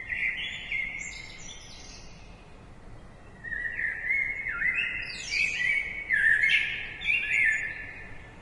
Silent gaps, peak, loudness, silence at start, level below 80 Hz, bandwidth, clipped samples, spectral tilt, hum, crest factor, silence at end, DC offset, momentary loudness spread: none; -12 dBFS; -26 LUFS; 0 s; -50 dBFS; 11.5 kHz; under 0.1%; -1 dB/octave; none; 18 dB; 0 s; under 0.1%; 21 LU